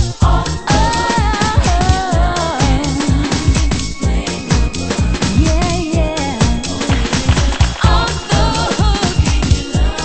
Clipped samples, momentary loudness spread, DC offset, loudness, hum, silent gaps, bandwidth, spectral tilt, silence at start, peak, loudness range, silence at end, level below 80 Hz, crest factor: under 0.1%; 4 LU; under 0.1%; -15 LUFS; none; none; 8.8 kHz; -5 dB/octave; 0 s; 0 dBFS; 2 LU; 0 s; -18 dBFS; 14 dB